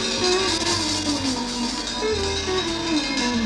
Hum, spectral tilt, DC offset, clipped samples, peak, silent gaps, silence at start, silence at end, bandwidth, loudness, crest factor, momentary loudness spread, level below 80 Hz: none; -2.5 dB/octave; under 0.1%; under 0.1%; -10 dBFS; none; 0 s; 0 s; 13.5 kHz; -22 LUFS; 14 dB; 5 LU; -42 dBFS